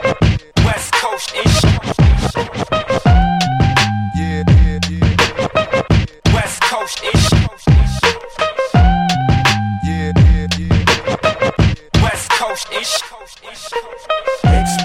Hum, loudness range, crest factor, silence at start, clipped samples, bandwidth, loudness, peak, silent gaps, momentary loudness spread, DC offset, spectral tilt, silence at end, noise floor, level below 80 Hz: none; 2 LU; 14 dB; 0 s; under 0.1%; 15.5 kHz; -15 LUFS; 0 dBFS; none; 7 LU; under 0.1%; -5 dB/octave; 0 s; -35 dBFS; -20 dBFS